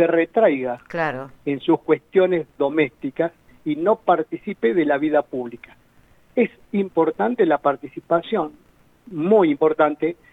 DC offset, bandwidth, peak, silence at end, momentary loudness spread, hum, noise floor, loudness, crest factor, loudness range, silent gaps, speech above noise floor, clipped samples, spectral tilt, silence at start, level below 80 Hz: under 0.1%; 4.8 kHz; -4 dBFS; 0.2 s; 10 LU; none; -54 dBFS; -21 LUFS; 18 dB; 2 LU; none; 34 dB; under 0.1%; -8.5 dB/octave; 0 s; -62 dBFS